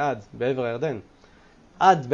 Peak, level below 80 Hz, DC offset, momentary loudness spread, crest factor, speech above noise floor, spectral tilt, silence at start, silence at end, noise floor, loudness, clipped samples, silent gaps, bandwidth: -4 dBFS; -60 dBFS; under 0.1%; 11 LU; 22 dB; 31 dB; -6 dB/octave; 0 s; 0 s; -53 dBFS; -24 LUFS; under 0.1%; none; 7.2 kHz